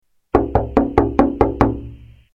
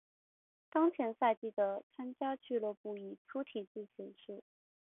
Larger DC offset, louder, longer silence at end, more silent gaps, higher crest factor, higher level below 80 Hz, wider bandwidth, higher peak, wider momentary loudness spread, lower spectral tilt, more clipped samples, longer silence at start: neither; first, -18 LUFS vs -38 LUFS; second, 0.25 s vs 0.6 s; second, none vs 1.37-1.42 s, 1.83-1.90 s, 2.77-2.84 s, 3.18-3.25 s, 3.67-3.75 s; about the same, 18 dB vs 20 dB; first, -30 dBFS vs -86 dBFS; first, 7.2 kHz vs 3.9 kHz; first, 0 dBFS vs -20 dBFS; second, 6 LU vs 17 LU; first, -9.5 dB/octave vs -1 dB/octave; neither; second, 0.35 s vs 0.75 s